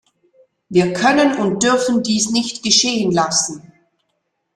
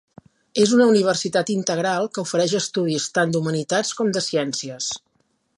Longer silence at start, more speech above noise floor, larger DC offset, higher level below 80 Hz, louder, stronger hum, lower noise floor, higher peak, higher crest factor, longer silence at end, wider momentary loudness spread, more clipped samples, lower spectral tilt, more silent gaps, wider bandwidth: first, 0.7 s vs 0.55 s; first, 55 dB vs 47 dB; neither; first, -56 dBFS vs -68 dBFS; first, -16 LUFS vs -21 LUFS; neither; about the same, -71 dBFS vs -68 dBFS; first, 0 dBFS vs -4 dBFS; about the same, 18 dB vs 18 dB; first, 0.95 s vs 0.6 s; second, 6 LU vs 11 LU; neither; about the same, -3 dB/octave vs -4 dB/octave; neither; about the same, 12.5 kHz vs 11.5 kHz